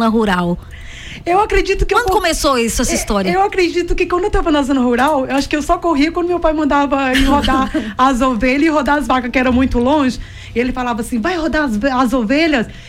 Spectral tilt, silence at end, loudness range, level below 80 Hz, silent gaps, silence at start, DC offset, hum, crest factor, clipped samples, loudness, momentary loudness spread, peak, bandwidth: -4.5 dB/octave; 0 s; 2 LU; -26 dBFS; none; 0 s; under 0.1%; none; 12 dB; under 0.1%; -15 LUFS; 6 LU; -2 dBFS; 16.5 kHz